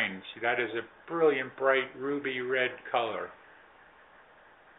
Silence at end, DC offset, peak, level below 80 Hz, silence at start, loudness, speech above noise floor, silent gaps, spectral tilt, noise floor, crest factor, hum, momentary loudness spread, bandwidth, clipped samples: 1.45 s; under 0.1%; -12 dBFS; -76 dBFS; 0 s; -30 LUFS; 27 dB; none; -1.5 dB/octave; -57 dBFS; 20 dB; none; 10 LU; 4 kHz; under 0.1%